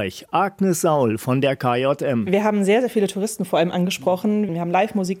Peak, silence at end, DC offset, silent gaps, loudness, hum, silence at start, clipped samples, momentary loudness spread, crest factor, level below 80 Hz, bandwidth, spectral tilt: -6 dBFS; 0 s; under 0.1%; none; -20 LUFS; none; 0 s; under 0.1%; 4 LU; 14 dB; -66 dBFS; 16.5 kHz; -5.5 dB/octave